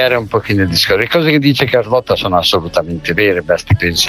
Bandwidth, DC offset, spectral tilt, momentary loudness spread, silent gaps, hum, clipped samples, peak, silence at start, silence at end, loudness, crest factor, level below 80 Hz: 19 kHz; under 0.1%; -4.5 dB/octave; 4 LU; none; none; under 0.1%; 0 dBFS; 0 s; 0 s; -13 LUFS; 12 dB; -36 dBFS